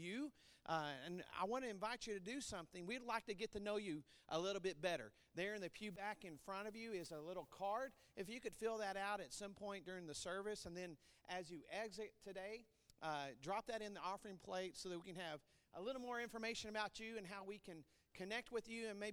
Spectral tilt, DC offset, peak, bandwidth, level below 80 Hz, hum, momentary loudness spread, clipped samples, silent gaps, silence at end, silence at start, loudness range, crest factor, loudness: -3.5 dB/octave; under 0.1%; -28 dBFS; over 20 kHz; -76 dBFS; none; 8 LU; under 0.1%; none; 0 s; 0 s; 4 LU; 20 dB; -49 LUFS